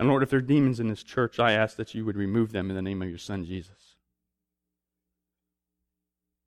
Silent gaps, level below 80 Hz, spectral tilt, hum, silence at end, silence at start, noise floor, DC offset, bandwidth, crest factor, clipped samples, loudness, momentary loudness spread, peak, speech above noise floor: none; -60 dBFS; -7 dB/octave; none; 2.85 s; 0 s; -86 dBFS; under 0.1%; 12 kHz; 20 dB; under 0.1%; -27 LUFS; 11 LU; -10 dBFS; 60 dB